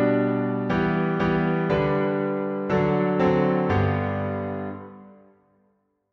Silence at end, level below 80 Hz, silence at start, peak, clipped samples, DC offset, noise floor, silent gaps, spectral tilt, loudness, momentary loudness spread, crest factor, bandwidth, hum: 1 s; -48 dBFS; 0 s; -10 dBFS; under 0.1%; under 0.1%; -68 dBFS; none; -9 dB/octave; -23 LUFS; 9 LU; 14 dB; 6.4 kHz; none